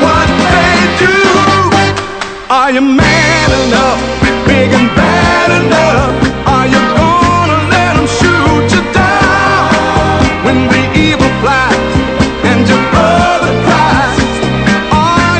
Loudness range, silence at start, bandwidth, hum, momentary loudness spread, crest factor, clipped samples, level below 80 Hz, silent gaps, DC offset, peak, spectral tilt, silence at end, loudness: 1 LU; 0 s; 9.2 kHz; none; 4 LU; 8 dB; 0.4%; -24 dBFS; none; under 0.1%; 0 dBFS; -5 dB/octave; 0 s; -8 LUFS